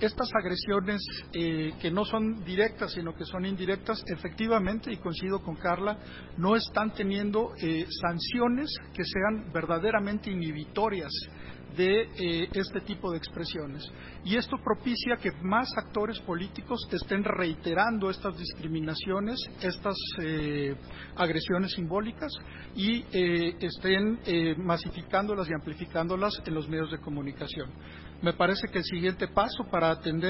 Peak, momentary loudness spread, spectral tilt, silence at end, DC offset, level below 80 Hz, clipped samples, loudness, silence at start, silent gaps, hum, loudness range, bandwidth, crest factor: -10 dBFS; 8 LU; -9.5 dB/octave; 0 s; under 0.1%; -50 dBFS; under 0.1%; -30 LUFS; 0 s; none; none; 3 LU; 5.8 kHz; 20 dB